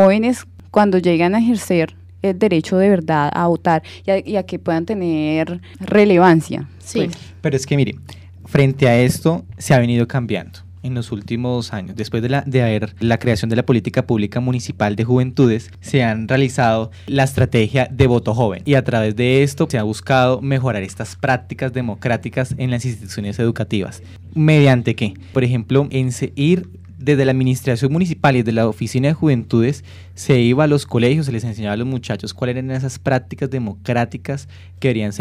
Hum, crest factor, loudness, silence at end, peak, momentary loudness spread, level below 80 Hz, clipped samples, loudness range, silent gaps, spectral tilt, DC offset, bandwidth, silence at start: none; 14 dB; -18 LUFS; 0 s; -2 dBFS; 10 LU; -48 dBFS; under 0.1%; 4 LU; none; -7 dB/octave; under 0.1%; 13.5 kHz; 0 s